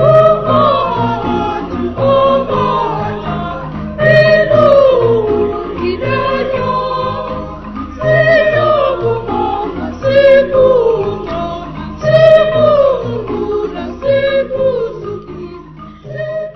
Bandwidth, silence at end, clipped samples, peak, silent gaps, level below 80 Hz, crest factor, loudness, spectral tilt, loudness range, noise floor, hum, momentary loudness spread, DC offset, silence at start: 6.2 kHz; 0 s; 0.2%; 0 dBFS; none; -36 dBFS; 12 dB; -12 LUFS; -7.5 dB/octave; 4 LU; -32 dBFS; none; 15 LU; under 0.1%; 0 s